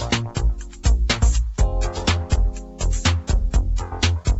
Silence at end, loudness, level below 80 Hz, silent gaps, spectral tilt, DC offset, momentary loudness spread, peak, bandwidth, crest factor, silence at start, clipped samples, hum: 0 s; -22 LUFS; -22 dBFS; none; -4.5 dB/octave; under 0.1%; 6 LU; -4 dBFS; 8.2 kHz; 16 dB; 0 s; under 0.1%; none